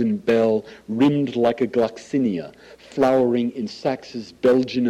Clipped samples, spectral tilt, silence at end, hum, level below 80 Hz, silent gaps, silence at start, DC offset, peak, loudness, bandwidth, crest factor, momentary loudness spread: under 0.1%; -7 dB/octave; 0 s; none; -60 dBFS; none; 0 s; under 0.1%; -8 dBFS; -21 LUFS; 10.5 kHz; 12 dB; 12 LU